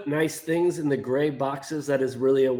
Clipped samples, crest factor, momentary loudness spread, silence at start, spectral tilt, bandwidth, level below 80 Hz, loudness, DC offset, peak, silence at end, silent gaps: under 0.1%; 12 dB; 5 LU; 0 s; -6 dB/octave; over 20 kHz; -68 dBFS; -25 LUFS; under 0.1%; -12 dBFS; 0 s; none